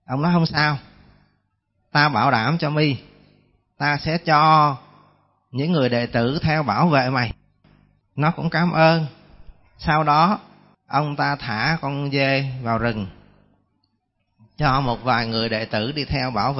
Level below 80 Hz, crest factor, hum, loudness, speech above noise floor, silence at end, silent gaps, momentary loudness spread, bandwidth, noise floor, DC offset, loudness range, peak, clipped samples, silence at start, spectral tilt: -46 dBFS; 18 dB; 50 Hz at -45 dBFS; -20 LUFS; 52 dB; 0 s; none; 10 LU; 6 kHz; -71 dBFS; under 0.1%; 5 LU; -4 dBFS; under 0.1%; 0.1 s; -9 dB/octave